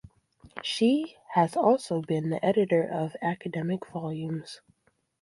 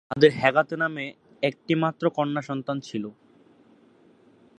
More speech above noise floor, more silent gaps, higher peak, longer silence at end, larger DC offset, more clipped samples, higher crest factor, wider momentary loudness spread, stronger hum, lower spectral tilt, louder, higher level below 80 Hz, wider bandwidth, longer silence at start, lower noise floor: first, 42 dB vs 33 dB; neither; second, -8 dBFS vs -2 dBFS; second, 0.65 s vs 1.5 s; neither; neither; about the same, 20 dB vs 24 dB; second, 12 LU vs 15 LU; neither; about the same, -6.5 dB/octave vs -6.5 dB/octave; second, -28 LUFS vs -25 LUFS; about the same, -68 dBFS vs -66 dBFS; first, 11.5 kHz vs 9 kHz; first, 0.55 s vs 0.1 s; first, -69 dBFS vs -57 dBFS